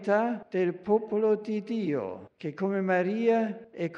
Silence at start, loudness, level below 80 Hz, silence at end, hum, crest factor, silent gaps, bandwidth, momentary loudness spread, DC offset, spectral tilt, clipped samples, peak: 0 s; -28 LUFS; -76 dBFS; 0 s; none; 16 dB; none; 7.4 kHz; 9 LU; under 0.1%; -8 dB/octave; under 0.1%; -12 dBFS